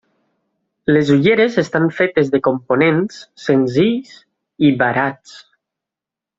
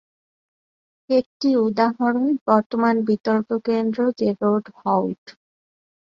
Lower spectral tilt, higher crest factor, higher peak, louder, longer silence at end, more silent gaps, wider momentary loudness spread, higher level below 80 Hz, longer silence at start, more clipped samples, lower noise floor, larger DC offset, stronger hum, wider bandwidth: about the same, -7 dB/octave vs -7.5 dB/octave; about the same, 14 dB vs 18 dB; about the same, -2 dBFS vs -4 dBFS; first, -16 LUFS vs -21 LUFS; first, 1 s vs 0.7 s; second, none vs 1.26-1.40 s, 2.41-2.46 s, 2.66-2.70 s, 3.20-3.24 s, 5.18-5.26 s; first, 11 LU vs 4 LU; first, -56 dBFS vs -66 dBFS; second, 0.9 s vs 1.1 s; neither; second, -86 dBFS vs under -90 dBFS; neither; neither; first, 7.8 kHz vs 6.4 kHz